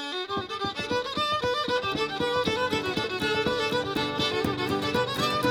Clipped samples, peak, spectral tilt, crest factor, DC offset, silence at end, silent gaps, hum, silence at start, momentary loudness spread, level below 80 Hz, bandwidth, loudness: under 0.1%; -12 dBFS; -4 dB/octave; 16 dB; under 0.1%; 0 s; none; none; 0 s; 4 LU; -54 dBFS; over 20 kHz; -27 LUFS